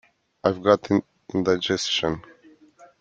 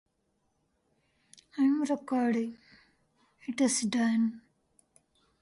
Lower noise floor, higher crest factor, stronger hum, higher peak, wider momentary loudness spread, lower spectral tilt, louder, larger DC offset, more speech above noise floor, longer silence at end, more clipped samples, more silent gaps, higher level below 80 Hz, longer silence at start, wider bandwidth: second, -53 dBFS vs -76 dBFS; about the same, 22 dB vs 18 dB; neither; first, -2 dBFS vs -16 dBFS; second, 9 LU vs 12 LU; about the same, -4.5 dB/octave vs -4 dB/octave; first, -23 LUFS vs -29 LUFS; neither; second, 31 dB vs 47 dB; second, 0.8 s vs 1 s; neither; neither; first, -58 dBFS vs -76 dBFS; second, 0.45 s vs 1.55 s; second, 9 kHz vs 11.5 kHz